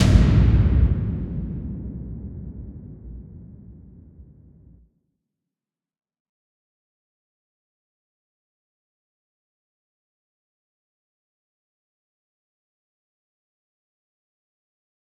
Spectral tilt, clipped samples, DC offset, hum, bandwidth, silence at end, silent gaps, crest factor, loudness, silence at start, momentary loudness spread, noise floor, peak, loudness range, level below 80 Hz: -7.5 dB/octave; under 0.1%; under 0.1%; none; 9.4 kHz; 10.8 s; none; 26 dB; -21 LUFS; 0 s; 25 LU; under -90 dBFS; 0 dBFS; 24 LU; -30 dBFS